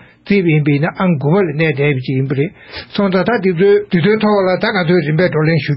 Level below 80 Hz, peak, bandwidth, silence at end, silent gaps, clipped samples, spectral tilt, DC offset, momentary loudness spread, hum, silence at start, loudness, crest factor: -50 dBFS; -2 dBFS; 5.8 kHz; 0 s; none; under 0.1%; -6 dB/octave; under 0.1%; 5 LU; none; 0.25 s; -14 LUFS; 12 dB